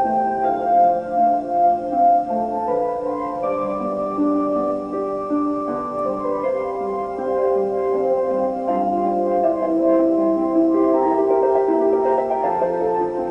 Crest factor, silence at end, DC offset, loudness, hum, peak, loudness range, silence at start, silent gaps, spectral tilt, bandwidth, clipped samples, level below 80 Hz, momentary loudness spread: 12 dB; 0 s; under 0.1%; -20 LUFS; none; -6 dBFS; 5 LU; 0 s; none; -9 dB/octave; 7 kHz; under 0.1%; -54 dBFS; 7 LU